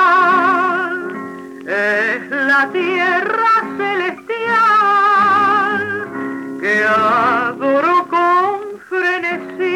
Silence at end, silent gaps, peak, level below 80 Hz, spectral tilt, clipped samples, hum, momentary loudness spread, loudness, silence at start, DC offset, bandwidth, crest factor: 0 s; none; -6 dBFS; -70 dBFS; -4.5 dB/octave; under 0.1%; none; 11 LU; -15 LUFS; 0 s; under 0.1%; 17.5 kHz; 10 dB